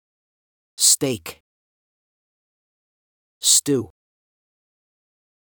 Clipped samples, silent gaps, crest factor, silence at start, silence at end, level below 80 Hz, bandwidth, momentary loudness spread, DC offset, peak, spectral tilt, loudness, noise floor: under 0.1%; 1.40-3.41 s; 24 dB; 0.8 s; 1.6 s; -68 dBFS; over 20 kHz; 14 LU; under 0.1%; -2 dBFS; -2 dB/octave; -17 LUFS; under -90 dBFS